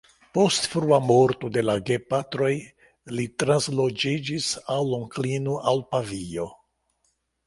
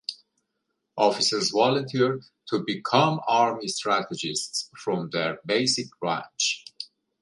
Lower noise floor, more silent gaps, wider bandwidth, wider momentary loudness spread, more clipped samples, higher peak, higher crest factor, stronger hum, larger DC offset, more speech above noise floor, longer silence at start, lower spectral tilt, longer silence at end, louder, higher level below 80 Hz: second, -72 dBFS vs -79 dBFS; neither; about the same, 11.5 kHz vs 11.5 kHz; about the same, 12 LU vs 11 LU; neither; about the same, -6 dBFS vs -4 dBFS; about the same, 20 dB vs 22 dB; neither; neither; second, 48 dB vs 54 dB; first, 0.35 s vs 0.1 s; first, -5 dB/octave vs -3.5 dB/octave; first, 0.95 s vs 0.35 s; about the same, -24 LUFS vs -25 LUFS; first, -58 dBFS vs -72 dBFS